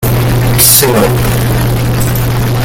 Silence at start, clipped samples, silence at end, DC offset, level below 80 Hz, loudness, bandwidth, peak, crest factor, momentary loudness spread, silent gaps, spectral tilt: 0 s; 0.8%; 0 s; under 0.1%; -20 dBFS; -9 LUFS; over 20 kHz; 0 dBFS; 10 dB; 8 LU; none; -4.5 dB/octave